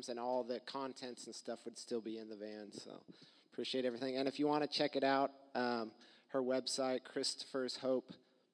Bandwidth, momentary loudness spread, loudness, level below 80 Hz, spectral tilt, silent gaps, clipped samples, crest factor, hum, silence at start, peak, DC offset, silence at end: 11 kHz; 14 LU; -40 LUFS; under -90 dBFS; -3.5 dB/octave; none; under 0.1%; 20 dB; none; 0 s; -20 dBFS; under 0.1%; 0.35 s